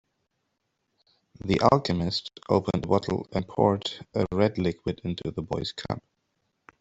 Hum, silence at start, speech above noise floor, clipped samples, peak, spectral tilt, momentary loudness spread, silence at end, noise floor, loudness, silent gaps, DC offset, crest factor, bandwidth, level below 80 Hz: none; 1.45 s; 52 dB; under 0.1%; -4 dBFS; -6.5 dB/octave; 10 LU; 0.8 s; -78 dBFS; -27 LUFS; none; under 0.1%; 24 dB; 8 kHz; -54 dBFS